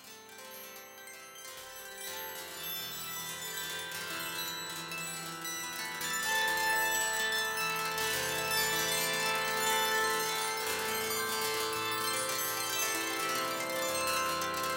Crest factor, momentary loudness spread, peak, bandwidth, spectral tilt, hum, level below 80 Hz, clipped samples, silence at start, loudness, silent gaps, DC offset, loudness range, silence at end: 16 dB; 15 LU; -18 dBFS; 17 kHz; -0.5 dB/octave; none; -68 dBFS; under 0.1%; 0 s; -32 LUFS; none; under 0.1%; 9 LU; 0 s